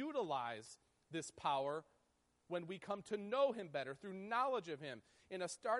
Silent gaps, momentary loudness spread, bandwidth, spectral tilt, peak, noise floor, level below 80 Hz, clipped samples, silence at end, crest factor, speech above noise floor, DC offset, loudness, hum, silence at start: none; 14 LU; 11.5 kHz; -4 dB/octave; -26 dBFS; -80 dBFS; -84 dBFS; under 0.1%; 0 s; 18 dB; 37 dB; under 0.1%; -43 LUFS; none; 0 s